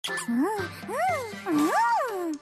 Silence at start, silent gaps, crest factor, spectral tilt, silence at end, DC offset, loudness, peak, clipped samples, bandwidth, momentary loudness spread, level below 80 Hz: 0.05 s; none; 12 dB; -4 dB/octave; 0.05 s; under 0.1%; -27 LUFS; -14 dBFS; under 0.1%; 15 kHz; 8 LU; -68 dBFS